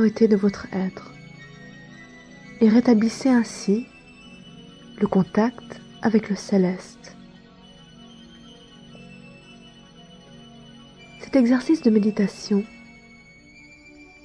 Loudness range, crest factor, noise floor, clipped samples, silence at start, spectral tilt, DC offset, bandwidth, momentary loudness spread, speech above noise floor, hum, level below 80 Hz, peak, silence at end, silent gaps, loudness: 6 LU; 18 dB; -49 dBFS; under 0.1%; 0 s; -7 dB/octave; under 0.1%; 10.5 kHz; 25 LU; 29 dB; none; -58 dBFS; -6 dBFS; 1.6 s; none; -21 LUFS